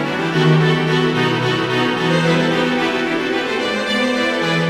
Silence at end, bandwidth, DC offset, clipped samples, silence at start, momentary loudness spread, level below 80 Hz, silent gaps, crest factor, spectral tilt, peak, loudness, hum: 0 s; 12.5 kHz; under 0.1%; under 0.1%; 0 s; 4 LU; -52 dBFS; none; 14 dB; -5.5 dB/octave; -2 dBFS; -16 LUFS; none